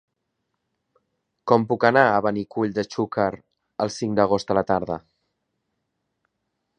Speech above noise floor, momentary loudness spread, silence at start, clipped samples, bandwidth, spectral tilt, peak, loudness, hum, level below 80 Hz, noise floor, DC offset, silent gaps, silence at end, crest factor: 56 dB; 14 LU; 1.45 s; under 0.1%; 10 kHz; -6 dB/octave; 0 dBFS; -22 LUFS; none; -58 dBFS; -78 dBFS; under 0.1%; none; 1.8 s; 24 dB